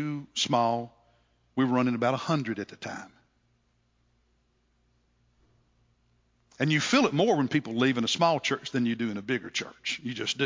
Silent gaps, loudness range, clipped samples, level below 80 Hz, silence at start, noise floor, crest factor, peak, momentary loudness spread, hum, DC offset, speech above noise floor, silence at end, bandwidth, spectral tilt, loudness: none; 11 LU; under 0.1%; -70 dBFS; 0 s; -70 dBFS; 20 dB; -10 dBFS; 11 LU; none; under 0.1%; 43 dB; 0 s; 7.6 kHz; -4.5 dB/octave; -27 LUFS